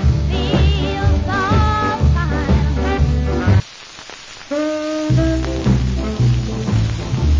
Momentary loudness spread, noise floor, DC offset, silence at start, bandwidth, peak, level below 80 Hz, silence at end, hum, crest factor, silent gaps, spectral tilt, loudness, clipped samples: 7 LU; -36 dBFS; under 0.1%; 0 s; 7.6 kHz; -4 dBFS; -20 dBFS; 0 s; none; 12 dB; none; -7 dB/octave; -17 LUFS; under 0.1%